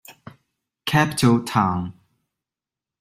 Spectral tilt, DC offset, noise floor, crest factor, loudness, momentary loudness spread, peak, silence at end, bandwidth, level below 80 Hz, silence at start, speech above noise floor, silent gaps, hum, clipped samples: -5.5 dB/octave; under 0.1%; -89 dBFS; 20 dB; -20 LUFS; 13 LU; -2 dBFS; 1.1 s; 16 kHz; -56 dBFS; 0.1 s; 70 dB; none; none; under 0.1%